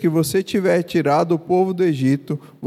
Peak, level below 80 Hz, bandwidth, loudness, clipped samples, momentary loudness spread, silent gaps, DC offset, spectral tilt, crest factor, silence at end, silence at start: -6 dBFS; -58 dBFS; 15.5 kHz; -19 LUFS; under 0.1%; 2 LU; none; under 0.1%; -6.5 dB/octave; 14 dB; 0 s; 0 s